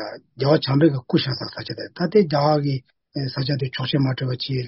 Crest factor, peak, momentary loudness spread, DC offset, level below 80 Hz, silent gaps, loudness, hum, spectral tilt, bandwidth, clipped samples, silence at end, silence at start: 18 dB; -4 dBFS; 12 LU; under 0.1%; -56 dBFS; none; -21 LUFS; none; -5.5 dB/octave; 6 kHz; under 0.1%; 0 s; 0 s